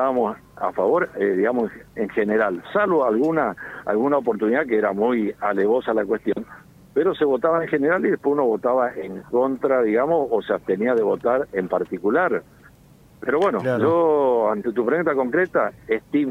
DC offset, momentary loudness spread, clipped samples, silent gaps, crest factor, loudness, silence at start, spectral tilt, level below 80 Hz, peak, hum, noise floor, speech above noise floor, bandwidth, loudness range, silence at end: under 0.1%; 7 LU; under 0.1%; none; 14 dB; -21 LUFS; 0 s; -8 dB/octave; -58 dBFS; -6 dBFS; none; -50 dBFS; 30 dB; 9 kHz; 1 LU; 0 s